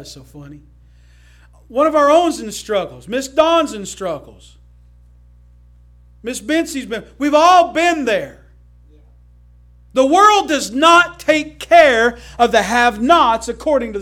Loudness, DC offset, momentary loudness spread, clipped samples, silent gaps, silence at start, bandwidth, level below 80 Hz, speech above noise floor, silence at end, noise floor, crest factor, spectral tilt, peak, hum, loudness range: -14 LUFS; under 0.1%; 15 LU; under 0.1%; none; 0 s; 16 kHz; -44 dBFS; 31 dB; 0 s; -46 dBFS; 16 dB; -3 dB/octave; 0 dBFS; 60 Hz at -45 dBFS; 9 LU